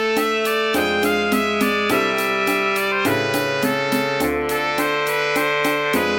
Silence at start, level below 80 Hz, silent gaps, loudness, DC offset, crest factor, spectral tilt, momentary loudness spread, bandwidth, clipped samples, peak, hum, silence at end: 0 s; -50 dBFS; none; -19 LUFS; under 0.1%; 14 dB; -3.5 dB/octave; 2 LU; 17 kHz; under 0.1%; -4 dBFS; none; 0 s